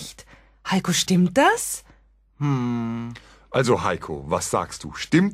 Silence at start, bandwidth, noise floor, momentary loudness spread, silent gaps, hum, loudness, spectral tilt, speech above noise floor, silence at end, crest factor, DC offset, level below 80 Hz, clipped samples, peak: 0 s; 16 kHz; -56 dBFS; 14 LU; none; none; -23 LUFS; -4.5 dB/octave; 34 dB; 0 s; 18 dB; under 0.1%; -50 dBFS; under 0.1%; -4 dBFS